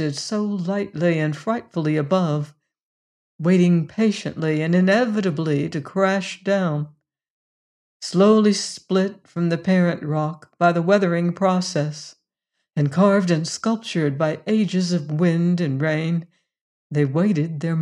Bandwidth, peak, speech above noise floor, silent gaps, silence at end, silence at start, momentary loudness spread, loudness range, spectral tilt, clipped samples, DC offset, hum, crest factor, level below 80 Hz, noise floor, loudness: 10.5 kHz; -4 dBFS; 58 dB; 2.80-3.39 s, 7.30-8.00 s, 16.61-16.90 s; 0 s; 0 s; 9 LU; 2 LU; -6.5 dB/octave; under 0.1%; under 0.1%; none; 18 dB; -68 dBFS; -78 dBFS; -21 LUFS